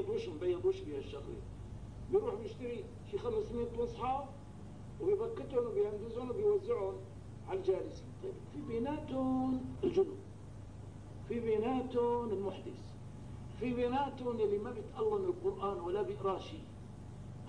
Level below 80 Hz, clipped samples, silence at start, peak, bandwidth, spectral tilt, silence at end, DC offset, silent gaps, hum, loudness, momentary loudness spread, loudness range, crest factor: -56 dBFS; under 0.1%; 0 s; -22 dBFS; 10.5 kHz; -8 dB/octave; 0 s; 0.1%; none; none; -37 LUFS; 16 LU; 3 LU; 16 dB